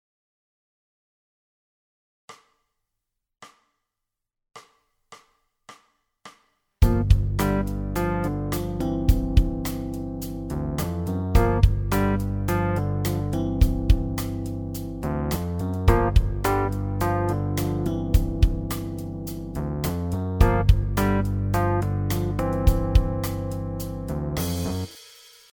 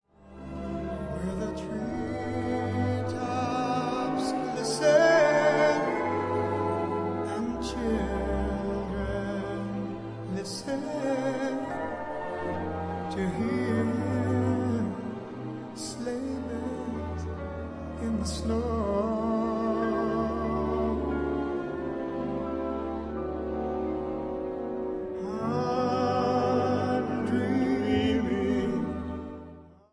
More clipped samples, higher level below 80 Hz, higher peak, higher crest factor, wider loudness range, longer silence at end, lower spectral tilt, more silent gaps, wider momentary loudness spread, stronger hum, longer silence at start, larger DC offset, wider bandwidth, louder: neither; first, -28 dBFS vs -44 dBFS; first, -4 dBFS vs -10 dBFS; about the same, 20 dB vs 20 dB; second, 3 LU vs 8 LU; first, 0.45 s vs 0.2 s; about the same, -7 dB/octave vs -6.5 dB/octave; neither; about the same, 10 LU vs 9 LU; neither; first, 2.3 s vs 0.2 s; neither; first, over 20 kHz vs 10.5 kHz; first, -25 LUFS vs -29 LUFS